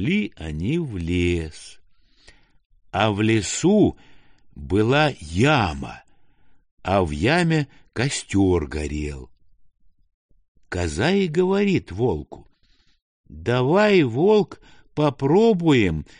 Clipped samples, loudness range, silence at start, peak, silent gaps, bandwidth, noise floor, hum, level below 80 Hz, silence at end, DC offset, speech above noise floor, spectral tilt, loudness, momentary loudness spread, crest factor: under 0.1%; 5 LU; 0 s; -4 dBFS; 2.66-2.70 s, 6.71-6.77 s, 10.14-10.29 s, 10.48-10.55 s, 13.02-13.24 s; 10 kHz; -60 dBFS; none; -42 dBFS; 0.15 s; under 0.1%; 39 dB; -6 dB/octave; -21 LUFS; 14 LU; 18 dB